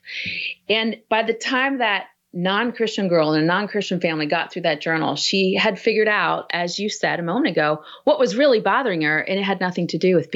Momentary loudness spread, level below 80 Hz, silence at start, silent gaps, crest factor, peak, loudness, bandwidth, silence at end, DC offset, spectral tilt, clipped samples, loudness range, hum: 5 LU; -70 dBFS; 0.05 s; none; 14 dB; -6 dBFS; -20 LUFS; 8 kHz; 0 s; under 0.1%; -4.5 dB/octave; under 0.1%; 1 LU; none